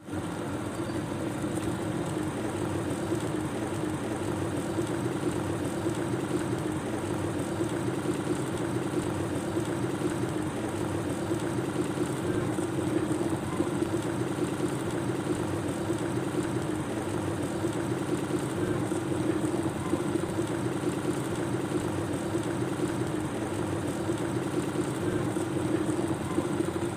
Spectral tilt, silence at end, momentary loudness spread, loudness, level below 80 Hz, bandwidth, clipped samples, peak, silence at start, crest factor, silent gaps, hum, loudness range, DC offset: -6 dB/octave; 0 s; 2 LU; -31 LUFS; -54 dBFS; 15.5 kHz; under 0.1%; -16 dBFS; 0 s; 14 dB; none; none; 1 LU; under 0.1%